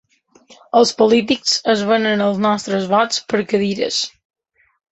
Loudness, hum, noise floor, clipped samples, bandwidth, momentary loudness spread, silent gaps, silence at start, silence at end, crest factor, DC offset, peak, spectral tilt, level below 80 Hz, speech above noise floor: -17 LUFS; none; -50 dBFS; under 0.1%; 8.4 kHz; 6 LU; none; 0.5 s; 0.85 s; 16 dB; under 0.1%; -2 dBFS; -4 dB/octave; -60 dBFS; 34 dB